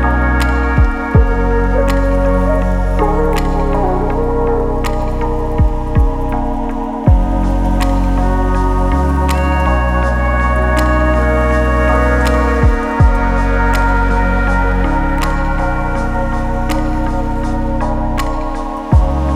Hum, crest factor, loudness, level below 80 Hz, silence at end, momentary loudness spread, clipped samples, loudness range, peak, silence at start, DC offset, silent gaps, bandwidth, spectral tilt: none; 12 dB; -15 LUFS; -14 dBFS; 0 s; 6 LU; under 0.1%; 4 LU; 0 dBFS; 0 s; under 0.1%; none; 13 kHz; -7.5 dB/octave